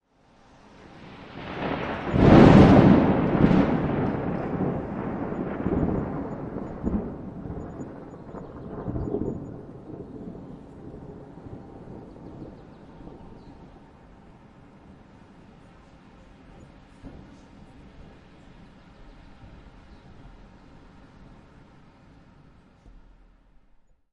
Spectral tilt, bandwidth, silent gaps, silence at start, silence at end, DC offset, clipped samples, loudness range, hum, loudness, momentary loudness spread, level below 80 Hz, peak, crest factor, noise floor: -9 dB/octave; 8 kHz; none; 1 s; 5.1 s; under 0.1%; under 0.1%; 26 LU; none; -22 LUFS; 28 LU; -42 dBFS; -2 dBFS; 24 dB; -58 dBFS